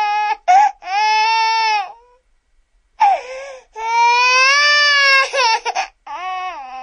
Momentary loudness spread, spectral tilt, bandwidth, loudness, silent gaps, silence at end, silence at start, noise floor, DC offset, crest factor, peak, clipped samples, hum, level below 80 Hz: 17 LU; 3.5 dB/octave; 10.5 kHz; -13 LUFS; none; 0 s; 0 s; -58 dBFS; under 0.1%; 16 dB; 0 dBFS; under 0.1%; none; -60 dBFS